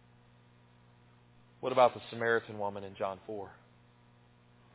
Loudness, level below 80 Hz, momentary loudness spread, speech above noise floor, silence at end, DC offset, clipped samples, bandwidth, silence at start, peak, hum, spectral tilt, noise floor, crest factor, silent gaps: -33 LUFS; -72 dBFS; 17 LU; 30 dB; 1.2 s; under 0.1%; under 0.1%; 4 kHz; 1.6 s; -12 dBFS; 60 Hz at -65 dBFS; -3 dB/octave; -63 dBFS; 24 dB; none